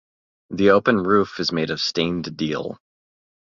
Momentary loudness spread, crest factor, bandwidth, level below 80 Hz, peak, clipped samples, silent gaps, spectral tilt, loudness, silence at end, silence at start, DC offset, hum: 11 LU; 20 dB; 7.6 kHz; -54 dBFS; -2 dBFS; under 0.1%; none; -5.5 dB/octave; -20 LUFS; 0.85 s; 0.5 s; under 0.1%; none